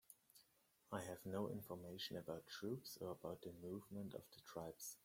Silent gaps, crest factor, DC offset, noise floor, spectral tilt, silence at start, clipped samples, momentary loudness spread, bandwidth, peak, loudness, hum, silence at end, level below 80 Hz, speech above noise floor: none; 22 dB; under 0.1%; -79 dBFS; -5 dB/octave; 0.1 s; under 0.1%; 9 LU; 16.5 kHz; -30 dBFS; -52 LUFS; none; 0.05 s; -82 dBFS; 27 dB